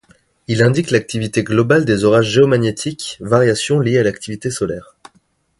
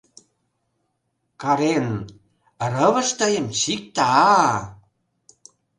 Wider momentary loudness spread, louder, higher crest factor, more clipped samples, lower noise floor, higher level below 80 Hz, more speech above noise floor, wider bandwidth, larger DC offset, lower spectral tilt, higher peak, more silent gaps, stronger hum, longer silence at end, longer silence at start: second, 11 LU vs 14 LU; first, -16 LUFS vs -20 LUFS; about the same, 16 dB vs 20 dB; neither; second, -59 dBFS vs -73 dBFS; first, -48 dBFS vs -58 dBFS; second, 44 dB vs 54 dB; about the same, 11.5 kHz vs 11.5 kHz; neither; first, -5.5 dB/octave vs -4 dB/octave; about the same, 0 dBFS vs -2 dBFS; neither; neither; second, 0.75 s vs 1.05 s; second, 0.5 s vs 1.4 s